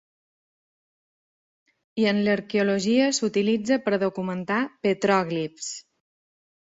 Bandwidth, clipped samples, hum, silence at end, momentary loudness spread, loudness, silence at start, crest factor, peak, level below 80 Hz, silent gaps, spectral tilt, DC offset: 8 kHz; under 0.1%; none; 0.95 s; 10 LU; -24 LUFS; 1.95 s; 18 dB; -8 dBFS; -68 dBFS; none; -4.5 dB/octave; under 0.1%